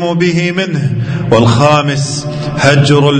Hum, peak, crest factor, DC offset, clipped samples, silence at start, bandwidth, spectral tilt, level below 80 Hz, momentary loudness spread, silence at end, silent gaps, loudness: none; 0 dBFS; 10 dB; under 0.1%; 0.5%; 0 s; 9.4 kHz; -5.5 dB/octave; -40 dBFS; 8 LU; 0 s; none; -11 LUFS